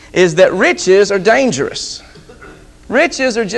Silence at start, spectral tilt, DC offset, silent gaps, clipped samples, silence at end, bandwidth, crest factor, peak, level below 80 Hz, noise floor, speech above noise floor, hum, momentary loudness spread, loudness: 0.15 s; -4 dB/octave; under 0.1%; none; under 0.1%; 0 s; 10.5 kHz; 14 dB; 0 dBFS; -44 dBFS; -38 dBFS; 26 dB; none; 11 LU; -12 LUFS